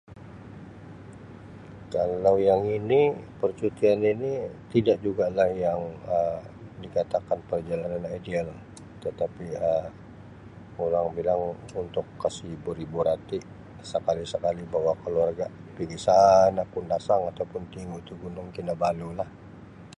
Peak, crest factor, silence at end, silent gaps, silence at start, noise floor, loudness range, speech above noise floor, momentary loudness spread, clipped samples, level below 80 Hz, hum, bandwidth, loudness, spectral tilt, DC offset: -6 dBFS; 20 dB; 0.05 s; none; 0.1 s; -46 dBFS; 7 LU; 20 dB; 23 LU; under 0.1%; -54 dBFS; none; 11 kHz; -27 LUFS; -6.5 dB/octave; under 0.1%